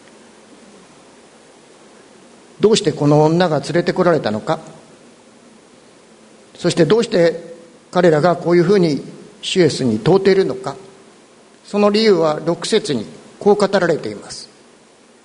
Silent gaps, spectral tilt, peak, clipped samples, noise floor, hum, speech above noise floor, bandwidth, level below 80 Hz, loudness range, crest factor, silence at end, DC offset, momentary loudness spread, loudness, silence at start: none; -5.5 dB/octave; 0 dBFS; under 0.1%; -48 dBFS; none; 33 dB; 11 kHz; -56 dBFS; 5 LU; 18 dB; 0.8 s; under 0.1%; 15 LU; -16 LUFS; 2.6 s